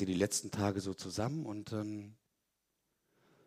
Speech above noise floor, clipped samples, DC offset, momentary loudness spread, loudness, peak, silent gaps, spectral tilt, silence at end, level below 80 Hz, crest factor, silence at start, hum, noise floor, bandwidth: 47 dB; under 0.1%; under 0.1%; 10 LU; -37 LUFS; -18 dBFS; none; -5 dB/octave; 1.35 s; -70 dBFS; 22 dB; 0 s; none; -84 dBFS; 15.5 kHz